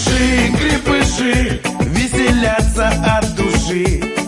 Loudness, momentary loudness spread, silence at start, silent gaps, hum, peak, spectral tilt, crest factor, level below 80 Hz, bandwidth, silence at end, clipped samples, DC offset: -15 LUFS; 4 LU; 0 s; none; none; 0 dBFS; -4.5 dB/octave; 14 dB; -22 dBFS; 11.5 kHz; 0 s; under 0.1%; under 0.1%